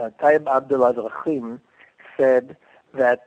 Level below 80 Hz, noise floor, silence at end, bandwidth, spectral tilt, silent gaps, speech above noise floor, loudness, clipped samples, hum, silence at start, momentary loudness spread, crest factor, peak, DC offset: -70 dBFS; -49 dBFS; 0.1 s; 8.4 kHz; -7.5 dB/octave; none; 29 dB; -20 LUFS; under 0.1%; none; 0 s; 17 LU; 18 dB; -4 dBFS; under 0.1%